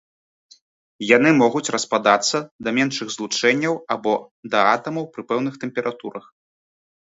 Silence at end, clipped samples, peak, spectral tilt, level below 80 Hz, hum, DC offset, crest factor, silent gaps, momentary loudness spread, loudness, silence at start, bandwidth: 1 s; under 0.1%; 0 dBFS; -3.5 dB/octave; -68 dBFS; none; under 0.1%; 22 dB; 2.51-2.59 s, 4.31-4.43 s; 12 LU; -20 LUFS; 1 s; 8 kHz